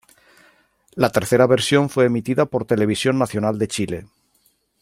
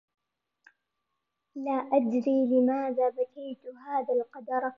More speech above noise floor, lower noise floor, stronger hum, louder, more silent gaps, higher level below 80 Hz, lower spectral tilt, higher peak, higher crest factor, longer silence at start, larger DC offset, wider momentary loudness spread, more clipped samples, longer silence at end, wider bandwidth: second, 45 dB vs 55 dB; second, -63 dBFS vs -83 dBFS; neither; first, -19 LUFS vs -28 LUFS; neither; first, -56 dBFS vs -86 dBFS; second, -5.5 dB/octave vs -8 dB/octave; first, -2 dBFS vs -12 dBFS; about the same, 18 dB vs 18 dB; second, 0.95 s vs 1.55 s; neither; second, 9 LU vs 16 LU; neither; first, 0.75 s vs 0.05 s; first, 16 kHz vs 6 kHz